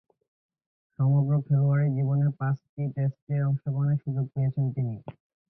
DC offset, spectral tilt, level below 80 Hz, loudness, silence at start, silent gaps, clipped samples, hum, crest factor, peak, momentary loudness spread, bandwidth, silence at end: under 0.1%; -13.5 dB/octave; -62 dBFS; -27 LUFS; 1 s; 2.69-2.77 s, 3.22-3.27 s; under 0.1%; none; 12 dB; -14 dBFS; 8 LU; 2.5 kHz; 0.4 s